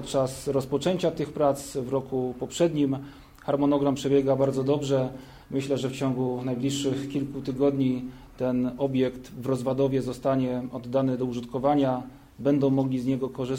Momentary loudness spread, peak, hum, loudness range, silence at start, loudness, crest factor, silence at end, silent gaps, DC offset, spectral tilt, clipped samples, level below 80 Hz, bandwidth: 9 LU; -10 dBFS; none; 2 LU; 0 s; -27 LUFS; 16 dB; 0 s; none; under 0.1%; -6.5 dB/octave; under 0.1%; -54 dBFS; 16 kHz